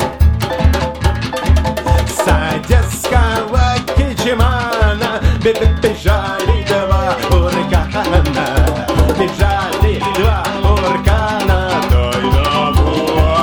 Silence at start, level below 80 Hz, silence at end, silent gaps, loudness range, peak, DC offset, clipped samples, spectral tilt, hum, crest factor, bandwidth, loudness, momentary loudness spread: 0 s; -16 dBFS; 0 s; none; 1 LU; 0 dBFS; under 0.1%; under 0.1%; -5.5 dB/octave; none; 12 dB; 19.5 kHz; -14 LUFS; 2 LU